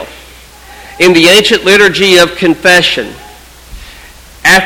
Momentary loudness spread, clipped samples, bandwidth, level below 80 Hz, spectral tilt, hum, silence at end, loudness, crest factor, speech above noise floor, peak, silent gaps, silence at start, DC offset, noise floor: 9 LU; 2%; over 20 kHz; -36 dBFS; -3 dB/octave; none; 0 s; -6 LUFS; 10 dB; 27 dB; 0 dBFS; none; 0 s; under 0.1%; -34 dBFS